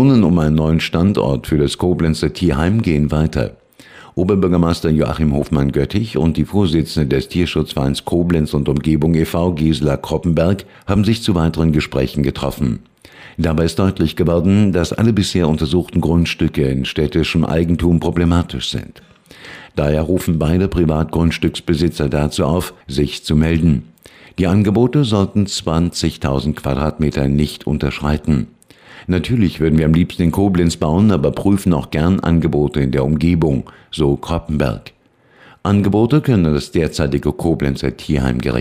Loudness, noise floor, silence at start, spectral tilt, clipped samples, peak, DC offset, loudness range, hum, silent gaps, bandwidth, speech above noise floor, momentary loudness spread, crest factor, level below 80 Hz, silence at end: -16 LUFS; -50 dBFS; 0 s; -7 dB/octave; under 0.1%; -2 dBFS; 0.1%; 3 LU; none; none; 16 kHz; 34 dB; 6 LU; 12 dB; -32 dBFS; 0 s